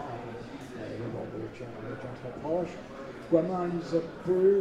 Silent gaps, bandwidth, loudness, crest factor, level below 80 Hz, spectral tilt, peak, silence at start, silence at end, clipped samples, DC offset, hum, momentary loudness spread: none; 9.6 kHz; -33 LUFS; 20 dB; -58 dBFS; -8 dB/octave; -10 dBFS; 0 s; 0 s; under 0.1%; under 0.1%; none; 15 LU